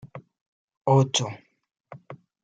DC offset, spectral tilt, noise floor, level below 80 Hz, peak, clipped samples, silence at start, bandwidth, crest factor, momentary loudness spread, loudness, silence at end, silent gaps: under 0.1%; -5 dB/octave; -46 dBFS; -66 dBFS; -8 dBFS; under 0.1%; 0.05 s; 9.2 kHz; 20 dB; 25 LU; -23 LUFS; 0.3 s; 0.41-0.68 s, 0.77-0.85 s